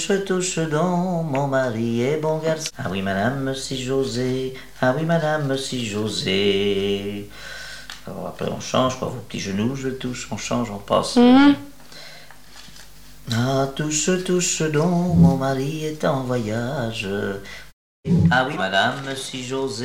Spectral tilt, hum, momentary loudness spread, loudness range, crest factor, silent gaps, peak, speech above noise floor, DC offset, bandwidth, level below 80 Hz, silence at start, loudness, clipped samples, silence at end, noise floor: -5 dB/octave; none; 16 LU; 5 LU; 18 dB; 17.73-18.03 s; -2 dBFS; 24 dB; 0.8%; 16 kHz; -48 dBFS; 0 s; -21 LUFS; under 0.1%; 0 s; -45 dBFS